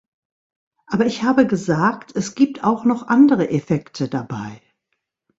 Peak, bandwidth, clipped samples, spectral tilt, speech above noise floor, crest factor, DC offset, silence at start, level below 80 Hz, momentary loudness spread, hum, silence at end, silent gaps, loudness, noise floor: -2 dBFS; 8 kHz; under 0.1%; -6.5 dB/octave; 57 dB; 18 dB; under 0.1%; 0.9 s; -58 dBFS; 12 LU; none; 0.8 s; none; -19 LUFS; -75 dBFS